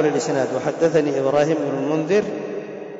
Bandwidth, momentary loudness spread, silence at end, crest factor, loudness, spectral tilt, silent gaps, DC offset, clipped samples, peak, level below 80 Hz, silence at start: 7.8 kHz; 9 LU; 0 s; 12 dB; -21 LUFS; -6 dB/octave; none; under 0.1%; under 0.1%; -8 dBFS; -64 dBFS; 0 s